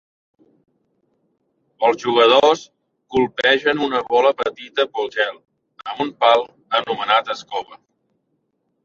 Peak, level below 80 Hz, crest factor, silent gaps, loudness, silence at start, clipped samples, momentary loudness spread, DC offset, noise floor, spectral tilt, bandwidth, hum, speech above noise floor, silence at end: -2 dBFS; -62 dBFS; 20 dB; none; -18 LUFS; 1.8 s; under 0.1%; 12 LU; under 0.1%; -70 dBFS; -3.5 dB/octave; 7.4 kHz; none; 52 dB; 1.1 s